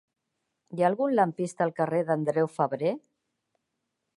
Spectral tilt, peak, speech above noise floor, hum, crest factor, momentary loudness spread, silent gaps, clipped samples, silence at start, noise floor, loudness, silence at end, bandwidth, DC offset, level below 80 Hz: -7.5 dB/octave; -10 dBFS; 55 dB; none; 20 dB; 6 LU; none; under 0.1%; 0.7 s; -82 dBFS; -27 LUFS; 1.2 s; 11.5 kHz; under 0.1%; -78 dBFS